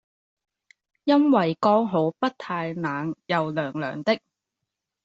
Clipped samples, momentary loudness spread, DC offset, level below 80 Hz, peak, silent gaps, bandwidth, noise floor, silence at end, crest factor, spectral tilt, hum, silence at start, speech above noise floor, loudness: under 0.1%; 9 LU; under 0.1%; -70 dBFS; -6 dBFS; none; 7.6 kHz; -84 dBFS; 0.9 s; 18 dB; -7.5 dB/octave; none; 1.05 s; 61 dB; -24 LUFS